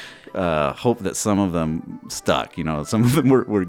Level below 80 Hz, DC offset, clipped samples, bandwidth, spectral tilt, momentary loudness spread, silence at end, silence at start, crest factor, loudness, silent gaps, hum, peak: -46 dBFS; under 0.1%; under 0.1%; 17 kHz; -5.5 dB/octave; 9 LU; 0 s; 0 s; 16 dB; -21 LUFS; none; none; -4 dBFS